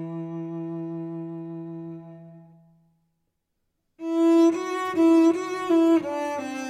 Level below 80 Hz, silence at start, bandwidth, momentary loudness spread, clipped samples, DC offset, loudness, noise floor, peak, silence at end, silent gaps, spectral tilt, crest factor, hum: -76 dBFS; 0 s; 9.8 kHz; 18 LU; under 0.1%; under 0.1%; -23 LUFS; -77 dBFS; -12 dBFS; 0 s; none; -6.5 dB/octave; 14 dB; none